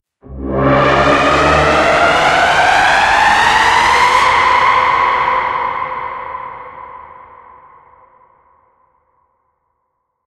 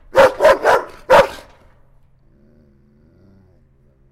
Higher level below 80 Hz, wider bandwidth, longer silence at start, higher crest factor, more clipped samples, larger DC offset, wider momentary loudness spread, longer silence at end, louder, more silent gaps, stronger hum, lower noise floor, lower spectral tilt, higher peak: first, -34 dBFS vs -44 dBFS; second, 14.5 kHz vs 16 kHz; first, 0.3 s vs 0.15 s; about the same, 14 dB vs 16 dB; neither; neither; first, 17 LU vs 9 LU; first, 3.15 s vs 2.75 s; about the same, -11 LUFS vs -13 LUFS; neither; neither; first, -69 dBFS vs -53 dBFS; about the same, -3.5 dB/octave vs -3.5 dB/octave; about the same, 0 dBFS vs -2 dBFS